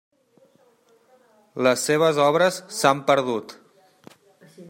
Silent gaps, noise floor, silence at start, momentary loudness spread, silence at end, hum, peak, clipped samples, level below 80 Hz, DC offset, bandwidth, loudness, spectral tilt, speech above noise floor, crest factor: none; -59 dBFS; 1.55 s; 12 LU; 0.05 s; none; -2 dBFS; under 0.1%; -72 dBFS; under 0.1%; 16 kHz; -21 LUFS; -4 dB/octave; 39 dB; 22 dB